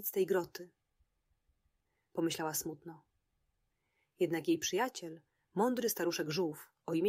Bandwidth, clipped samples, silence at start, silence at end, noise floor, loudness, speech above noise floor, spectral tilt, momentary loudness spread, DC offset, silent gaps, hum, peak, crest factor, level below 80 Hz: 16 kHz; under 0.1%; 0 s; 0 s; -82 dBFS; -36 LUFS; 46 dB; -4 dB/octave; 17 LU; under 0.1%; none; none; -20 dBFS; 18 dB; -78 dBFS